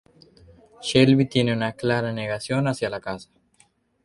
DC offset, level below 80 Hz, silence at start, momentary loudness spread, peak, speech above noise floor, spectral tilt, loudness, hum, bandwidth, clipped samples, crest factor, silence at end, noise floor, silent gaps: under 0.1%; -56 dBFS; 0.8 s; 15 LU; -2 dBFS; 40 dB; -6 dB/octave; -22 LUFS; none; 11.5 kHz; under 0.1%; 22 dB; 0.8 s; -62 dBFS; none